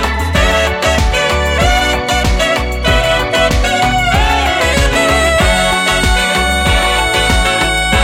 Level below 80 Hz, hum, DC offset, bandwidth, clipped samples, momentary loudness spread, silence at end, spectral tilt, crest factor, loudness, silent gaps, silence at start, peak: -18 dBFS; none; under 0.1%; 16.5 kHz; under 0.1%; 2 LU; 0 s; -3.5 dB/octave; 12 dB; -11 LUFS; none; 0 s; 0 dBFS